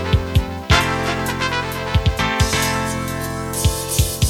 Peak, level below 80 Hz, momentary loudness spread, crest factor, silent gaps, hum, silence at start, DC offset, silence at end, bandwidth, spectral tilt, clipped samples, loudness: 0 dBFS; -26 dBFS; 6 LU; 18 dB; none; none; 0 s; under 0.1%; 0 s; 19 kHz; -4 dB/octave; under 0.1%; -19 LUFS